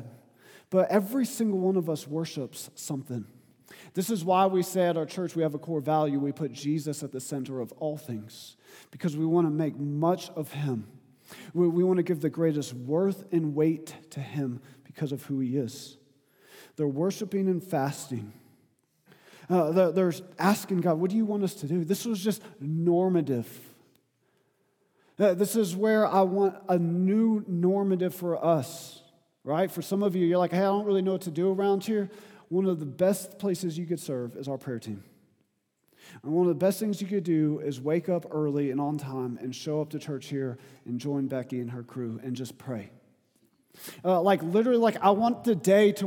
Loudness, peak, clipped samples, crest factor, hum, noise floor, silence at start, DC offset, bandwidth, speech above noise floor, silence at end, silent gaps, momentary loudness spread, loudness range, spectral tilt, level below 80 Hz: -28 LUFS; -8 dBFS; under 0.1%; 20 dB; none; -74 dBFS; 0 s; under 0.1%; 19 kHz; 46 dB; 0 s; none; 13 LU; 6 LU; -6.5 dB/octave; -82 dBFS